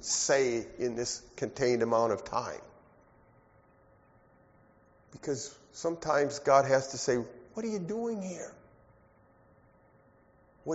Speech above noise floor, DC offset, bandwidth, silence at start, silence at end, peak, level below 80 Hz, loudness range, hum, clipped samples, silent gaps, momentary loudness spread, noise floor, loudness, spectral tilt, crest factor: 33 dB; under 0.1%; 8 kHz; 0 s; 0 s; -10 dBFS; -66 dBFS; 12 LU; none; under 0.1%; none; 17 LU; -63 dBFS; -31 LUFS; -4 dB/octave; 24 dB